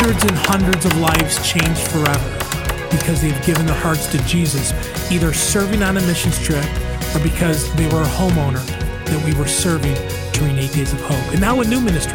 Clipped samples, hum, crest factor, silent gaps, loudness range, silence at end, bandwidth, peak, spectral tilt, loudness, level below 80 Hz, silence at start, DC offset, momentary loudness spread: under 0.1%; none; 14 dB; none; 2 LU; 0 s; 18 kHz; -4 dBFS; -4.5 dB/octave; -17 LUFS; -26 dBFS; 0 s; under 0.1%; 6 LU